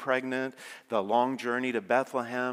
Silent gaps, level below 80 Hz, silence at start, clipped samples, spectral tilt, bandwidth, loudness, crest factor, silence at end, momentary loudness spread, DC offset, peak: none; -88 dBFS; 0 s; under 0.1%; -5 dB/octave; 16 kHz; -30 LUFS; 20 dB; 0 s; 7 LU; under 0.1%; -10 dBFS